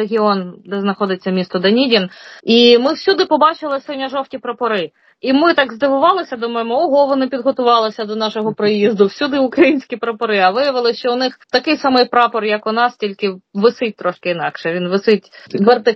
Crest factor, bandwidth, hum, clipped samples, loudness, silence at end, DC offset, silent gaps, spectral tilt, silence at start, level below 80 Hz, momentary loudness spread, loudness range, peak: 14 dB; 6.2 kHz; none; under 0.1%; -15 LUFS; 0 s; under 0.1%; none; -6 dB/octave; 0 s; -66 dBFS; 9 LU; 3 LU; 0 dBFS